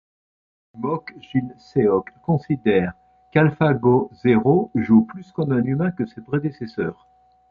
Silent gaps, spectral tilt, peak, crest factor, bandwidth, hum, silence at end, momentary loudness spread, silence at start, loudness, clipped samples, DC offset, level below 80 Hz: none; -10 dB/octave; -2 dBFS; 18 dB; 5.2 kHz; none; 0.6 s; 11 LU; 0.75 s; -21 LUFS; under 0.1%; under 0.1%; -52 dBFS